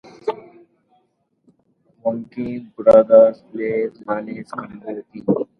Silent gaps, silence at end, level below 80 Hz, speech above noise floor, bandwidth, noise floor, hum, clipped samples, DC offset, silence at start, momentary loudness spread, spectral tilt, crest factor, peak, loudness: none; 0.15 s; -58 dBFS; 48 dB; 5.2 kHz; -66 dBFS; none; under 0.1%; under 0.1%; 0.25 s; 19 LU; -8.5 dB/octave; 20 dB; 0 dBFS; -18 LUFS